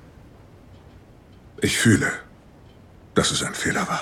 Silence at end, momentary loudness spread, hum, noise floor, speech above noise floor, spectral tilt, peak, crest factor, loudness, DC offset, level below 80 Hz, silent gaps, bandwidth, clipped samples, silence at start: 0 s; 9 LU; none; -48 dBFS; 27 dB; -4 dB/octave; -4 dBFS; 22 dB; -22 LUFS; under 0.1%; -50 dBFS; none; 17.5 kHz; under 0.1%; 1.45 s